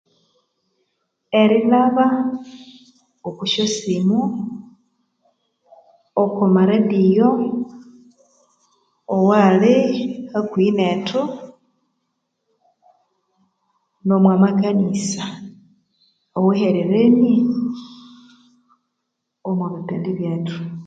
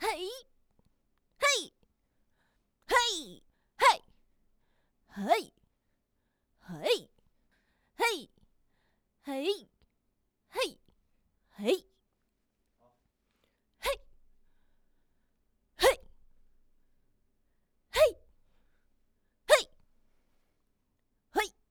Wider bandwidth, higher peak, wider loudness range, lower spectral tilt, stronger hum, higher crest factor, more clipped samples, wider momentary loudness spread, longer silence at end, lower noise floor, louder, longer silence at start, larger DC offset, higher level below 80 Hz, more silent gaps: second, 9 kHz vs over 20 kHz; first, 0 dBFS vs -8 dBFS; second, 6 LU vs 9 LU; first, -6.5 dB/octave vs -1.5 dB/octave; neither; second, 18 dB vs 28 dB; neither; second, 15 LU vs 18 LU; second, 0 s vs 0.2 s; about the same, -77 dBFS vs -79 dBFS; first, -18 LUFS vs -30 LUFS; first, 1.3 s vs 0 s; neither; about the same, -64 dBFS vs -62 dBFS; neither